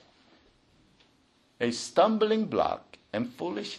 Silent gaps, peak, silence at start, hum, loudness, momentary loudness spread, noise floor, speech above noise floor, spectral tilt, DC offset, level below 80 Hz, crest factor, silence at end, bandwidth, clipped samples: none; -10 dBFS; 1.6 s; none; -28 LUFS; 11 LU; -66 dBFS; 38 dB; -4.5 dB/octave; under 0.1%; -66 dBFS; 20 dB; 0 s; 11.5 kHz; under 0.1%